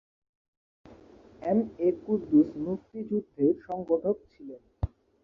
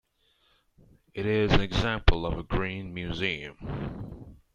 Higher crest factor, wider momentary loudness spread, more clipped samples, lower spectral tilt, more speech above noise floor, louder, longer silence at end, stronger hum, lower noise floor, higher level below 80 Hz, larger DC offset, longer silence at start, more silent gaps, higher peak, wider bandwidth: second, 18 dB vs 26 dB; second, 13 LU vs 16 LU; neither; first, -11.5 dB/octave vs -6.5 dB/octave; second, 26 dB vs 41 dB; about the same, -29 LUFS vs -29 LUFS; first, 0.35 s vs 0.2 s; neither; second, -53 dBFS vs -68 dBFS; second, -50 dBFS vs -34 dBFS; neither; second, 0.9 s vs 1.15 s; neither; second, -12 dBFS vs -2 dBFS; second, 4.7 kHz vs 7.4 kHz